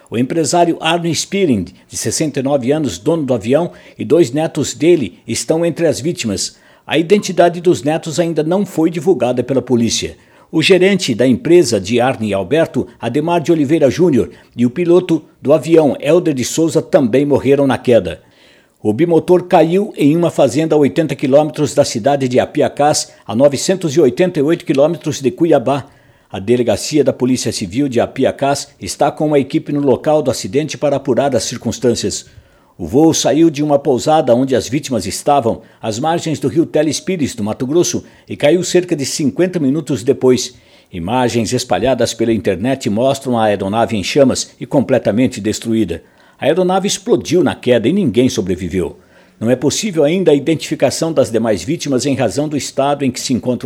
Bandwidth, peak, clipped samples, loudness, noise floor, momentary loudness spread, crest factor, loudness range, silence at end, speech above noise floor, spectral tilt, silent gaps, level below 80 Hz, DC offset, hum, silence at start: 16 kHz; 0 dBFS; under 0.1%; -14 LUFS; -48 dBFS; 7 LU; 14 dB; 3 LU; 0 s; 34 dB; -5 dB/octave; none; -48 dBFS; under 0.1%; none; 0.1 s